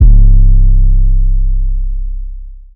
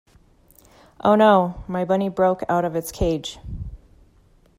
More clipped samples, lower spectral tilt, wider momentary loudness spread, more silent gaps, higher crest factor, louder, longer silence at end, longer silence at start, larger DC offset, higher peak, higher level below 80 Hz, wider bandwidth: first, 2% vs under 0.1%; first, -14 dB/octave vs -6 dB/octave; second, 17 LU vs 20 LU; neither; second, 6 dB vs 18 dB; first, -13 LUFS vs -20 LUFS; second, 0.15 s vs 0.85 s; second, 0 s vs 1.05 s; neither; first, 0 dBFS vs -4 dBFS; first, -6 dBFS vs -40 dBFS; second, 0.6 kHz vs 16 kHz